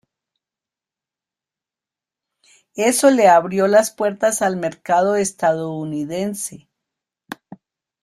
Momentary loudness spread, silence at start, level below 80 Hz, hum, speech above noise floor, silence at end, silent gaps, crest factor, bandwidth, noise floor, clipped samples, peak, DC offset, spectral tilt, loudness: 20 LU; 2.75 s; -64 dBFS; none; 72 dB; 0.45 s; none; 18 dB; 15 kHz; -89 dBFS; under 0.1%; -2 dBFS; under 0.1%; -4 dB/octave; -17 LUFS